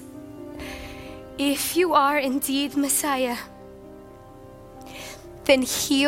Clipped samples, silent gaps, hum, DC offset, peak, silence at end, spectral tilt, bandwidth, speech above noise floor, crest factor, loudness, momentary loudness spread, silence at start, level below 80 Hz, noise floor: under 0.1%; none; none; under 0.1%; -4 dBFS; 0 s; -2.5 dB/octave; 16.5 kHz; 23 dB; 22 dB; -22 LUFS; 24 LU; 0 s; -52 dBFS; -44 dBFS